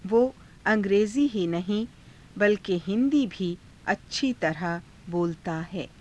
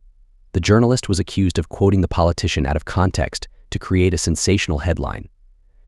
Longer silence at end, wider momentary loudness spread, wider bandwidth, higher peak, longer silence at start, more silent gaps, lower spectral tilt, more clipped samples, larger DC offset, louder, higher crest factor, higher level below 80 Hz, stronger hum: second, 0.15 s vs 0.6 s; about the same, 10 LU vs 11 LU; about the same, 11 kHz vs 12 kHz; second, -10 dBFS vs -2 dBFS; second, 0.05 s vs 0.55 s; neither; about the same, -6 dB/octave vs -5.5 dB/octave; neither; neither; second, -27 LUFS vs -19 LUFS; about the same, 16 dB vs 18 dB; second, -56 dBFS vs -30 dBFS; neither